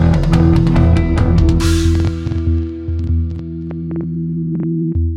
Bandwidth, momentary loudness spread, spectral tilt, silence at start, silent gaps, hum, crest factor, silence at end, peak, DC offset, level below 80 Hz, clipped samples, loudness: 11.5 kHz; 10 LU; -7.5 dB/octave; 0 s; none; none; 14 dB; 0 s; 0 dBFS; under 0.1%; -20 dBFS; under 0.1%; -16 LUFS